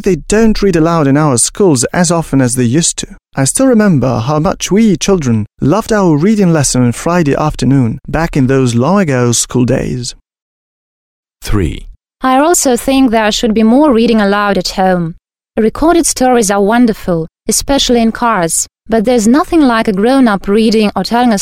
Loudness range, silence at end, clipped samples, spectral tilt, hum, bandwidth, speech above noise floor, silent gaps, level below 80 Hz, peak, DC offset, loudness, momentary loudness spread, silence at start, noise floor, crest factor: 3 LU; 0 s; under 0.1%; -5 dB/octave; none; 16 kHz; over 80 dB; 10.42-11.23 s; -30 dBFS; 0 dBFS; under 0.1%; -10 LUFS; 6 LU; 0 s; under -90 dBFS; 10 dB